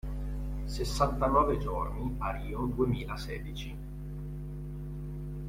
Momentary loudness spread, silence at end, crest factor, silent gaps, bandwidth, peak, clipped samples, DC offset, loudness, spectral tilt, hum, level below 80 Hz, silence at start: 14 LU; 0 s; 20 dB; none; 16 kHz; -12 dBFS; under 0.1%; under 0.1%; -34 LUFS; -6.5 dB/octave; 50 Hz at -40 dBFS; -38 dBFS; 0.05 s